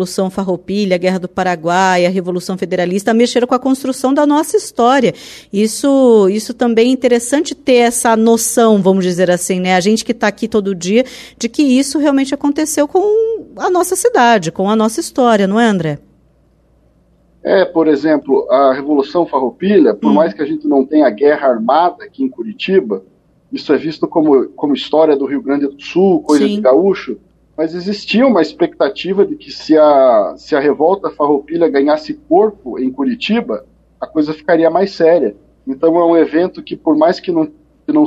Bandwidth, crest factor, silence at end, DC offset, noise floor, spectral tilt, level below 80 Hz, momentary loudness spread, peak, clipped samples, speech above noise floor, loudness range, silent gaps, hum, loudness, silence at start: 14 kHz; 12 dB; 0 s; under 0.1%; -52 dBFS; -5 dB/octave; -54 dBFS; 9 LU; 0 dBFS; under 0.1%; 40 dB; 3 LU; none; none; -13 LUFS; 0 s